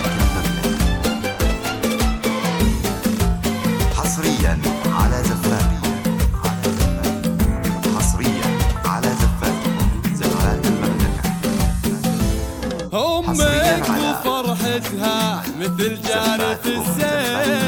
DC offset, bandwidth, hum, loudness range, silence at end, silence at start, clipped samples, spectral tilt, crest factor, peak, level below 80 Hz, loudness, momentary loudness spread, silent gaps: under 0.1%; 19 kHz; none; 1 LU; 0 s; 0 s; under 0.1%; -5 dB/octave; 16 dB; -2 dBFS; -26 dBFS; -20 LUFS; 3 LU; none